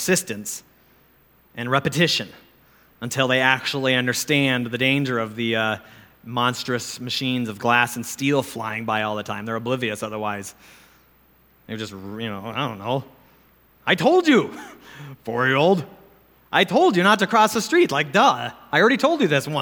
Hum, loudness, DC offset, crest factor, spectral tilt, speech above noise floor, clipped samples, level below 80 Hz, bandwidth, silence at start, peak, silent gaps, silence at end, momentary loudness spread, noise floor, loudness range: none; -21 LUFS; under 0.1%; 20 dB; -4 dB/octave; 36 dB; under 0.1%; -64 dBFS; 20 kHz; 0 s; -2 dBFS; none; 0 s; 15 LU; -57 dBFS; 11 LU